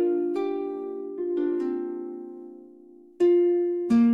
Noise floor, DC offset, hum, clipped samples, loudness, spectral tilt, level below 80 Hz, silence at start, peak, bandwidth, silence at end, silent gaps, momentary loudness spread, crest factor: -50 dBFS; under 0.1%; none; under 0.1%; -26 LUFS; -8 dB/octave; -70 dBFS; 0 s; -12 dBFS; 5.2 kHz; 0 s; none; 17 LU; 12 dB